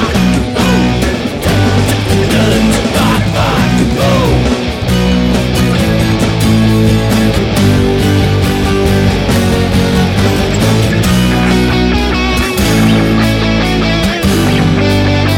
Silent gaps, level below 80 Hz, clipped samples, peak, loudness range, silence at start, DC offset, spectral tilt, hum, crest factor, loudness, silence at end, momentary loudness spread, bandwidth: none; -20 dBFS; under 0.1%; 0 dBFS; 1 LU; 0 s; under 0.1%; -5.5 dB/octave; none; 10 dB; -11 LUFS; 0 s; 2 LU; 17.5 kHz